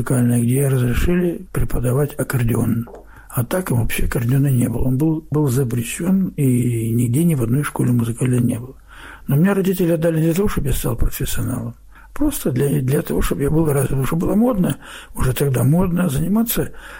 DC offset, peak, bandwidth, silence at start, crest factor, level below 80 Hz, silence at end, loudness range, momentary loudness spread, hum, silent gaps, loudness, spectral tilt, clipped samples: under 0.1%; -8 dBFS; 16.5 kHz; 0 s; 10 dB; -30 dBFS; 0 s; 2 LU; 7 LU; none; none; -19 LUFS; -7 dB/octave; under 0.1%